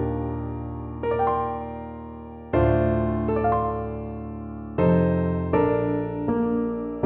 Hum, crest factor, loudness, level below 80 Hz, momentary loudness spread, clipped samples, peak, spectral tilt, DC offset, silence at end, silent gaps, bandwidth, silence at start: none; 16 dB; -25 LUFS; -38 dBFS; 14 LU; under 0.1%; -8 dBFS; -12.5 dB/octave; under 0.1%; 0 s; none; 4 kHz; 0 s